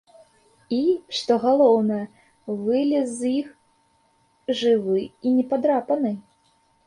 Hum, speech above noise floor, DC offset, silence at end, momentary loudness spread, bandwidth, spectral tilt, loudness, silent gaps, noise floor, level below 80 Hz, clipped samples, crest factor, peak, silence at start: none; 42 dB; under 0.1%; 0.65 s; 15 LU; 11 kHz; -5.5 dB/octave; -22 LUFS; none; -63 dBFS; -68 dBFS; under 0.1%; 18 dB; -6 dBFS; 0.7 s